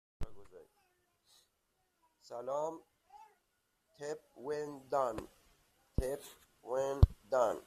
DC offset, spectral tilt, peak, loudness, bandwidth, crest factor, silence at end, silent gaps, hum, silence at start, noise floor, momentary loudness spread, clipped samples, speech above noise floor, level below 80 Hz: under 0.1%; -7 dB/octave; -10 dBFS; -37 LUFS; 15 kHz; 30 dB; 0.05 s; none; none; 0.2 s; -80 dBFS; 21 LU; under 0.1%; 45 dB; -44 dBFS